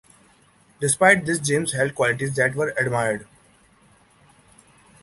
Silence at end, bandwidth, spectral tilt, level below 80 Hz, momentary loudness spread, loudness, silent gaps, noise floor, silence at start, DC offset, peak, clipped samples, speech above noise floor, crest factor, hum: 1.8 s; 12 kHz; -4 dB/octave; -58 dBFS; 9 LU; -21 LUFS; none; -57 dBFS; 0.8 s; under 0.1%; -2 dBFS; under 0.1%; 36 dB; 22 dB; none